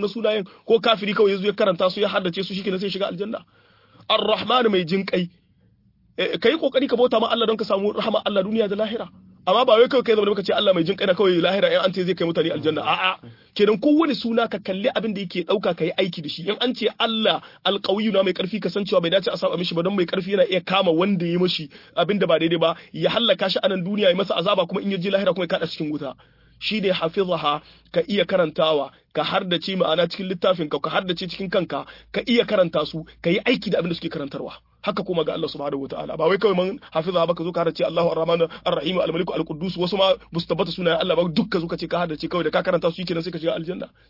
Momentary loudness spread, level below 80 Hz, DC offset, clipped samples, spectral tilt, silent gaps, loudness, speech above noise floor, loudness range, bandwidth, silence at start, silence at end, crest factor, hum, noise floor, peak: 8 LU; -58 dBFS; under 0.1%; under 0.1%; -7 dB/octave; none; -22 LUFS; 38 dB; 3 LU; 5.8 kHz; 0 s; 0.25 s; 18 dB; none; -59 dBFS; -4 dBFS